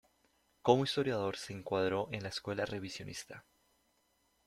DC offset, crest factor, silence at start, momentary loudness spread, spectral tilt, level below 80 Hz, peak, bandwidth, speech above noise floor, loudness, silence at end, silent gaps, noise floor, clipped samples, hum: under 0.1%; 26 dB; 0.65 s; 15 LU; -5 dB/octave; -70 dBFS; -12 dBFS; 14 kHz; 40 dB; -35 LUFS; 1.05 s; none; -76 dBFS; under 0.1%; none